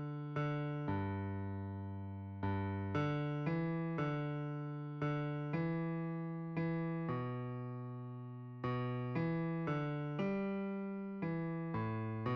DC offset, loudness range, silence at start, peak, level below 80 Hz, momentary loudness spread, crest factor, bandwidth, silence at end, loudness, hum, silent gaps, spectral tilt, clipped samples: under 0.1%; 2 LU; 0 s; -26 dBFS; -68 dBFS; 7 LU; 14 dB; 6.2 kHz; 0 s; -40 LUFS; none; none; -7.5 dB/octave; under 0.1%